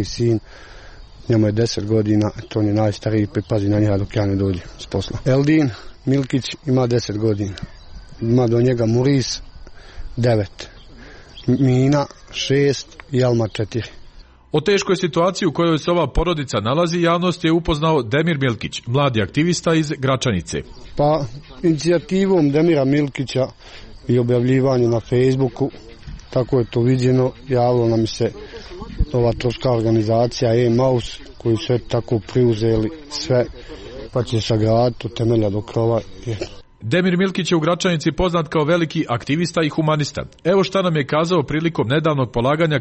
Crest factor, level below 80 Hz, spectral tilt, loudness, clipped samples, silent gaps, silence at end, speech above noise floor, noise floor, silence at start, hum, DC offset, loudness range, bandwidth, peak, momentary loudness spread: 12 dB; -38 dBFS; -6.5 dB/octave; -19 LUFS; under 0.1%; none; 0 s; 24 dB; -42 dBFS; 0 s; none; under 0.1%; 2 LU; 8.6 kHz; -6 dBFS; 10 LU